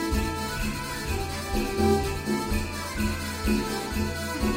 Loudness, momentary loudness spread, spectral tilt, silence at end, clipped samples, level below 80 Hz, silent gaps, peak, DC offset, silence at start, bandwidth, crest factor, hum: -28 LUFS; 6 LU; -5 dB/octave; 0 s; under 0.1%; -34 dBFS; none; -10 dBFS; under 0.1%; 0 s; 16 kHz; 16 dB; none